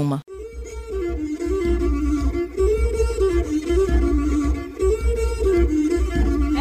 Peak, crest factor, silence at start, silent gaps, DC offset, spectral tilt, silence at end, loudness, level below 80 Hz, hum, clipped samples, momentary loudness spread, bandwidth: -8 dBFS; 12 dB; 0 s; none; under 0.1%; -7.5 dB/octave; 0 s; -22 LUFS; -24 dBFS; none; under 0.1%; 8 LU; 10.5 kHz